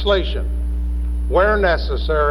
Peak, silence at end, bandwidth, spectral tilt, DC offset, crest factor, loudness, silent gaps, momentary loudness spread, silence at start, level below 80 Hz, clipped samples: -4 dBFS; 0 s; 10.5 kHz; -7 dB/octave; under 0.1%; 14 dB; -19 LUFS; none; 8 LU; 0 s; -20 dBFS; under 0.1%